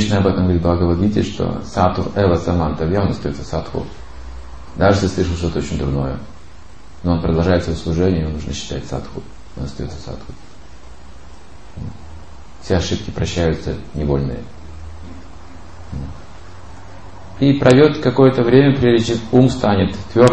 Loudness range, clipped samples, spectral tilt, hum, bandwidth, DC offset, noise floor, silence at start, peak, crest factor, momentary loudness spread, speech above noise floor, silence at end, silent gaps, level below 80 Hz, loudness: 15 LU; under 0.1%; -7 dB/octave; none; 8.8 kHz; 2%; -41 dBFS; 0 s; 0 dBFS; 18 dB; 24 LU; 25 dB; 0 s; none; -32 dBFS; -17 LUFS